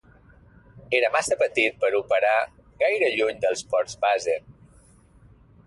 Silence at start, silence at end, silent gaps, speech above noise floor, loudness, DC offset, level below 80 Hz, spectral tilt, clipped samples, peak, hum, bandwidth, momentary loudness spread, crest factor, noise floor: 0.75 s; 1.15 s; none; 32 dB; -23 LUFS; under 0.1%; -60 dBFS; -2.5 dB/octave; under 0.1%; -8 dBFS; none; 11.5 kHz; 5 LU; 18 dB; -54 dBFS